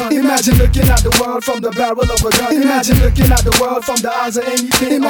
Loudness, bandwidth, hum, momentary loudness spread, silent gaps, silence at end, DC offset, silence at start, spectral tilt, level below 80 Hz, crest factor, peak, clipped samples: -13 LUFS; over 20 kHz; none; 6 LU; none; 0 s; under 0.1%; 0 s; -4.5 dB/octave; -18 dBFS; 12 dB; 0 dBFS; under 0.1%